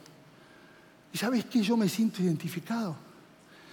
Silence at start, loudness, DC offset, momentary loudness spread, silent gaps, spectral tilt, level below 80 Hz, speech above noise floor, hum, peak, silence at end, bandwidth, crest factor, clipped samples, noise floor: 1.15 s; -30 LUFS; under 0.1%; 11 LU; none; -5.5 dB/octave; -80 dBFS; 27 dB; none; -16 dBFS; 0 s; 17 kHz; 16 dB; under 0.1%; -56 dBFS